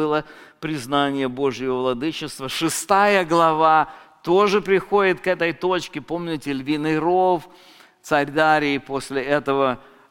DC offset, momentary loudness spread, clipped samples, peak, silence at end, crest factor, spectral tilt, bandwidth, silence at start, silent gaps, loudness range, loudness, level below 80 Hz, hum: under 0.1%; 11 LU; under 0.1%; -2 dBFS; 0.3 s; 18 dB; -4.5 dB/octave; 17 kHz; 0 s; none; 4 LU; -20 LUFS; -54 dBFS; none